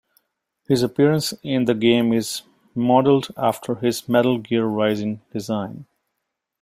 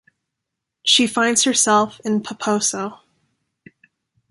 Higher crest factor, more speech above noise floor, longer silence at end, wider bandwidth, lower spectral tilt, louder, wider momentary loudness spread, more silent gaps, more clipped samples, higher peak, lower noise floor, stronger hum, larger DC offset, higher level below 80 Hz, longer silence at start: about the same, 18 dB vs 18 dB; second, 59 dB vs 63 dB; second, 0.8 s vs 1.35 s; first, 16 kHz vs 11.5 kHz; first, -5.5 dB/octave vs -1.5 dB/octave; second, -20 LUFS vs -17 LUFS; about the same, 11 LU vs 9 LU; neither; neither; about the same, -2 dBFS vs -2 dBFS; about the same, -79 dBFS vs -81 dBFS; neither; neither; first, -60 dBFS vs -66 dBFS; second, 0.7 s vs 0.85 s